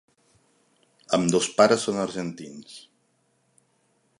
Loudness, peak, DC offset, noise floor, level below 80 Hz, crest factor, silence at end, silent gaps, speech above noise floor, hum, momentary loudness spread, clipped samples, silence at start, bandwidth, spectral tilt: -23 LUFS; -4 dBFS; under 0.1%; -69 dBFS; -66 dBFS; 24 dB; 1.4 s; none; 45 dB; none; 23 LU; under 0.1%; 1.1 s; 11.5 kHz; -4 dB/octave